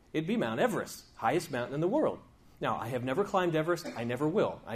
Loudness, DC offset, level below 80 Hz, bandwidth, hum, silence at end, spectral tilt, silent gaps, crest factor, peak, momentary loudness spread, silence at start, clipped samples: -32 LUFS; under 0.1%; -64 dBFS; 15.5 kHz; none; 0 s; -6 dB/octave; none; 16 dB; -14 dBFS; 7 LU; 0.15 s; under 0.1%